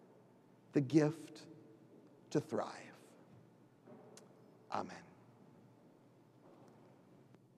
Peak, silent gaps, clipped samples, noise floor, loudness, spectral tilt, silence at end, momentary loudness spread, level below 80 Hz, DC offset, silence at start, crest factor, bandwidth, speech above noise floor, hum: -18 dBFS; none; under 0.1%; -66 dBFS; -39 LUFS; -7 dB/octave; 2.55 s; 30 LU; under -90 dBFS; under 0.1%; 0.75 s; 26 dB; 12.5 kHz; 29 dB; none